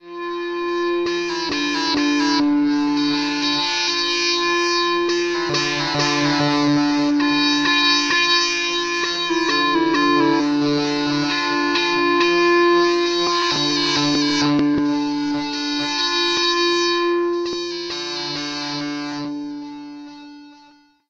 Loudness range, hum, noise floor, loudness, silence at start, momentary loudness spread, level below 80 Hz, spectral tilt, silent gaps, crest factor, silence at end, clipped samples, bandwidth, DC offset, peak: 4 LU; none; -51 dBFS; -18 LUFS; 0.05 s; 10 LU; -54 dBFS; -3 dB/octave; none; 14 dB; 0.55 s; under 0.1%; 8 kHz; under 0.1%; -6 dBFS